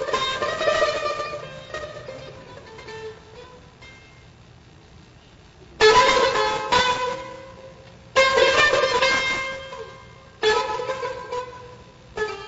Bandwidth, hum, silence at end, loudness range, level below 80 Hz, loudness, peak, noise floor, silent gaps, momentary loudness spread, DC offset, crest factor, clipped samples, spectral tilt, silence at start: 8 kHz; none; 0 s; 19 LU; -50 dBFS; -20 LUFS; -4 dBFS; -49 dBFS; none; 23 LU; under 0.1%; 20 dB; under 0.1%; -2 dB/octave; 0 s